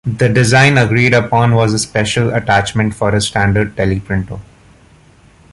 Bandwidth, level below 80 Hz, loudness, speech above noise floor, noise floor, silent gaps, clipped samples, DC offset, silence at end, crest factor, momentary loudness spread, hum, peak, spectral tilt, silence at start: 11.5 kHz; -36 dBFS; -13 LUFS; 33 dB; -45 dBFS; none; under 0.1%; under 0.1%; 1.1 s; 14 dB; 9 LU; none; 0 dBFS; -5.5 dB/octave; 0.05 s